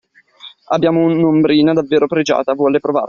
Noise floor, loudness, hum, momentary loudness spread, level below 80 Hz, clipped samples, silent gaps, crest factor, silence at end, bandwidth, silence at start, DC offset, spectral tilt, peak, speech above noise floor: -41 dBFS; -14 LUFS; none; 4 LU; -56 dBFS; under 0.1%; none; 14 dB; 0 s; 7 kHz; 0.45 s; under 0.1%; -5.5 dB/octave; -2 dBFS; 27 dB